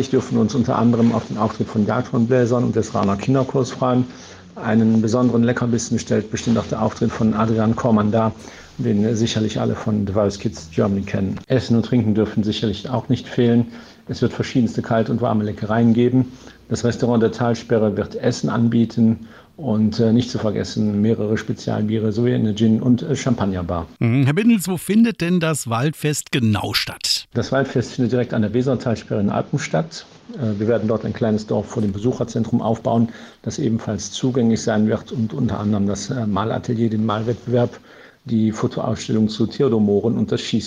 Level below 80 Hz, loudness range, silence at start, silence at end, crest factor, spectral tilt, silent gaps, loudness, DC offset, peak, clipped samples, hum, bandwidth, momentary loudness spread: -50 dBFS; 3 LU; 0 s; 0 s; 14 dB; -6.5 dB/octave; none; -20 LUFS; under 0.1%; -4 dBFS; under 0.1%; none; 13.5 kHz; 7 LU